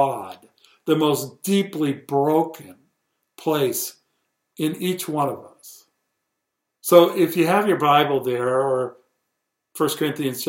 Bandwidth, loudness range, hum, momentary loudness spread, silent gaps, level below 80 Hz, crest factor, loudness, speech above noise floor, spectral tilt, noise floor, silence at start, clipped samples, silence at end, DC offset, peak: 16.5 kHz; 7 LU; none; 15 LU; none; -72 dBFS; 22 dB; -21 LUFS; 59 dB; -5 dB/octave; -79 dBFS; 0 s; under 0.1%; 0 s; under 0.1%; 0 dBFS